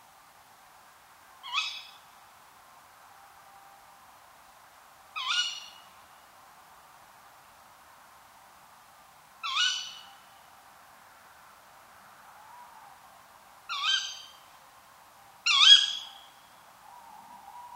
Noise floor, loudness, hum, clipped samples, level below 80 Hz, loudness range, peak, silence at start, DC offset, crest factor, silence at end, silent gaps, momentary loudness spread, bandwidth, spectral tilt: -56 dBFS; -24 LUFS; none; under 0.1%; -80 dBFS; 16 LU; -4 dBFS; 1.45 s; under 0.1%; 30 dB; 0 s; none; 33 LU; 16 kHz; 3.5 dB/octave